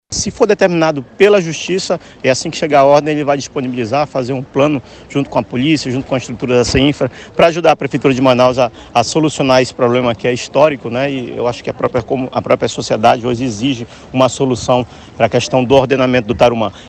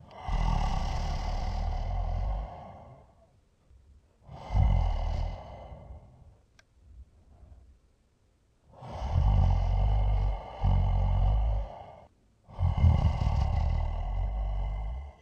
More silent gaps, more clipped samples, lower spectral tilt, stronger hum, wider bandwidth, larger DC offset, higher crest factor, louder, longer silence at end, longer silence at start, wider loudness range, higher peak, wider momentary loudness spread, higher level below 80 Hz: neither; neither; second, -5 dB/octave vs -7.5 dB/octave; neither; first, 10 kHz vs 6.8 kHz; neither; about the same, 14 dB vs 18 dB; first, -14 LUFS vs -31 LUFS; about the same, 0 s vs 0.1 s; about the same, 0.1 s vs 0.1 s; second, 3 LU vs 9 LU; first, 0 dBFS vs -12 dBFS; second, 8 LU vs 21 LU; second, -40 dBFS vs -32 dBFS